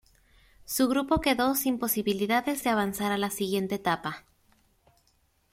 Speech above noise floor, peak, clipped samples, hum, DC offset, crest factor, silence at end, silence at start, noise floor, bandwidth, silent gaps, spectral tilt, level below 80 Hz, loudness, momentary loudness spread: 41 dB; -10 dBFS; under 0.1%; none; under 0.1%; 18 dB; 1.3 s; 0.7 s; -68 dBFS; 16.5 kHz; none; -4 dB/octave; -54 dBFS; -27 LUFS; 6 LU